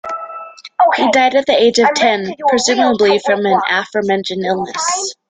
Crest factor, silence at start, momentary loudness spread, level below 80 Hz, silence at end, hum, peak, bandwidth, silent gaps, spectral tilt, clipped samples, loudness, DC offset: 14 dB; 0.05 s; 8 LU; -58 dBFS; 0.15 s; none; 0 dBFS; 9.6 kHz; none; -3 dB/octave; under 0.1%; -14 LUFS; under 0.1%